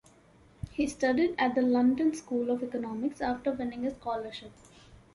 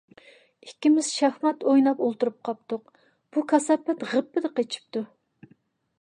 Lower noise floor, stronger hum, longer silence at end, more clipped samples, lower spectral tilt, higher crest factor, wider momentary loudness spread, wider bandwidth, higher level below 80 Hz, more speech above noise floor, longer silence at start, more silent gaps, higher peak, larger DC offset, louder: about the same, -59 dBFS vs -62 dBFS; neither; second, 0.2 s vs 0.95 s; neither; first, -5.5 dB/octave vs -3.5 dB/octave; about the same, 16 dB vs 18 dB; about the same, 11 LU vs 13 LU; about the same, 11.5 kHz vs 10.5 kHz; first, -56 dBFS vs -82 dBFS; second, 30 dB vs 38 dB; about the same, 0.65 s vs 0.65 s; neither; second, -16 dBFS vs -8 dBFS; neither; second, -30 LUFS vs -25 LUFS